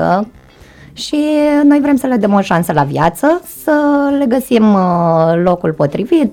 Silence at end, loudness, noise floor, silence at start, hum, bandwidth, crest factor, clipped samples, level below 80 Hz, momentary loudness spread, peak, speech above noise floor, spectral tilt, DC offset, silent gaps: 0 s; -12 LUFS; -39 dBFS; 0 s; none; 17.5 kHz; 10 dB; under 0.1%; -44 dBFS; 6 LU; -2 dBFS; 28 dB; -7 dB/octave; under 0.1%; none